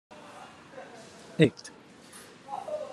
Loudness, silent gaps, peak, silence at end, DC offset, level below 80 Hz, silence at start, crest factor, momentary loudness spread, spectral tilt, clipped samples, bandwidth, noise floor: -29 LUFS; none; -6 dBFS; 0 s; under 0.1%; -74 dBFS; 0.1 s; 28 dB; 23 LU; -6.5 dB/octave; under 0.1%; 12.5 kHz; -51 dBFS